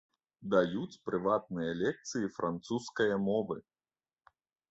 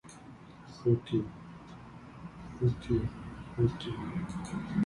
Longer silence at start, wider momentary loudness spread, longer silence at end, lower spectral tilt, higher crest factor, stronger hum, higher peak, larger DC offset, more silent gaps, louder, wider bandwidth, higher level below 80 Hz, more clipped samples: first, 0.4 s vs 0.05 s; second, 9 LU vs 20 LU; first, 1.1 s vs 0 s; second, -5.5 dB/octave vs -8 dB/octave; about the same, 20 dB vs 20 dB; neither; about the same, -14 dBFS vs -16 dBFS; neither; neither; about the same, -34 LUFS vs -34 LUFS; second, 8.2 kHz vs 11 kHz; second, -68 dBFS vs -52 dBFS; neither